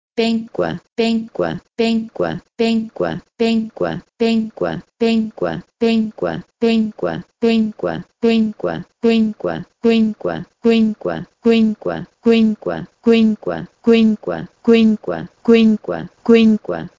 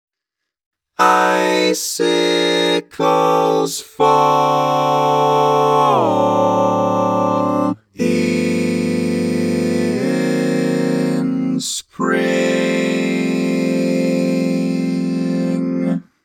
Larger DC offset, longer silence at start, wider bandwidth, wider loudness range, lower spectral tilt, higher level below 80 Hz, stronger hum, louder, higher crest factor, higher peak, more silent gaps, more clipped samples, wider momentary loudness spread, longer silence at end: neither; second, 0.15 s vs 1 s; second, 7.6 kHz vs 17.5 kHz; about the same, 4 LU vs 3 LU; first, -7 dB/octave vs -5 dB/octave; first, -52 dBFS vs -68 dBFS; neither; about the same, -18 LUFS vs -16 LUFS; about the same, 16 dB vs 16 dB; about the same, 0 dBFS vs 0 dBFS; first, 0.92-0.96 s vs none; neither; first, 11 LU vs 6 LU; about the same, 0.1 s vs 0.2 s